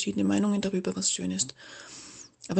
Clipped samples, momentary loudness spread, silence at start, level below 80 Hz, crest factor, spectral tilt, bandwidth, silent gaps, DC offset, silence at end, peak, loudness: under 0.1%; 19 LU; 0 s; -64 dBFS; 18 dB; -4 dB/octave; 9.4 kHz; none; under 0.1%; 0 s; -12 dBFS; -28 LUFS